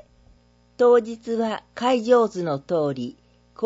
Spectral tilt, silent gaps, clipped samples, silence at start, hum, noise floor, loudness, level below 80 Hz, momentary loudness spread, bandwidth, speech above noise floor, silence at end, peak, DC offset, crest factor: -6 dB/octave; none; under 0.1%; 0.8 s; 60 Hz at -45 dBFS; -57 dBFS; -22 LUFS; -62 dBFS; 10 LU; 8 kHz; 36 dB; 0 s; -6 dBFS; under 0.1%; 16 dB